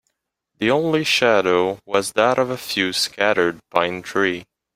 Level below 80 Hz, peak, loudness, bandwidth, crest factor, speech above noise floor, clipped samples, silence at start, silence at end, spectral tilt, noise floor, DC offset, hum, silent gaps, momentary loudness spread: -60 dBFS; -2 dBFS; -19 LUFS; 16 kHz; 18 dB; 56 dB; under 0.1%; 0.6 s; 0.35 s; -3.5 dB/octave; -76 dBFS; under 0.1%; none; none; 6 LU